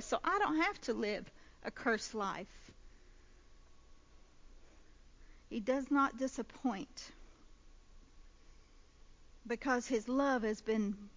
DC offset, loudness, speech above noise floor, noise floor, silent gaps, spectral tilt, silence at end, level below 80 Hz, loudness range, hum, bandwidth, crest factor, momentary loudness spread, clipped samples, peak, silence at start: under 0.1%; -37 LUFS; 24 dB; -61 dBFS; none; -4.5 dB/octave; 0.05 s; -62 dBFS; 10 LU; none; 7.6 kHz; 20 dB; 15 LU; under 0.1%; -18 dBFS; 0 s